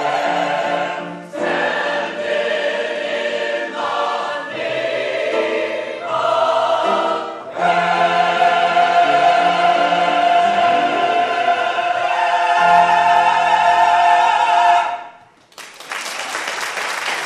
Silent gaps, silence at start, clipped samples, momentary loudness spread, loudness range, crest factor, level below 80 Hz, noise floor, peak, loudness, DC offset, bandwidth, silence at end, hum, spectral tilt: none; 0 s; under 0.1%; 10 LU; 7 LU; 14 dB; -64 dBFS; -45 dBFS; -2 dBFS; -16 LUFS; under 0.1%; 13 kHz; 0 s; none; -3 dB/octave